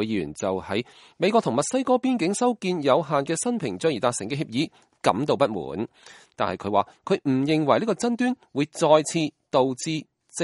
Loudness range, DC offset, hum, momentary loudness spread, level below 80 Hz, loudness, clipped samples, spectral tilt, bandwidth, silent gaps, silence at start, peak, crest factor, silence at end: 3 LU; under 0.1%; none; 9 LU; -64 dBFS; -24 LUFS; under 0.1%; -5 dB/octave; 11.5 kHz; none; 0 s; -4 dBFS; 20 dB; 0 s